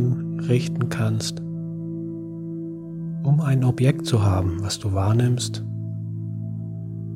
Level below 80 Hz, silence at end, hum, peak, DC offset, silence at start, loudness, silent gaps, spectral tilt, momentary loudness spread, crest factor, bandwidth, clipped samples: -56 dBFS; 0 s; none; -6 dBFS; under 0.1%; 0 s; -24 LUFS; none; -6.5 dB/octave; 12 LU; 18 dB; 14.5 kHz; under 0.1%